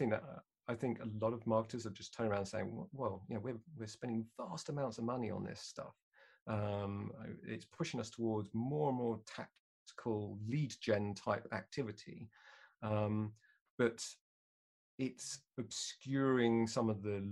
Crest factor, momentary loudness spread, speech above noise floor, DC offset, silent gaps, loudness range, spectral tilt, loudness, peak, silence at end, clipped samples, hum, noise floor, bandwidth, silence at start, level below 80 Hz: 20 dB; 13 LU; over 50 dB; under 0.1%; 6.03-6.11 s, 6.42-6.46 s, 9.59-9.86 s, 13.61-13.78 s, 14.21-14.98 s; 4 LU; -6 dB/octave; -41 LUFS; -20 dBFS; 0 s; under 0.1%; none; under -90 dBFS; 12 kHz; 0 s; -74 dBFS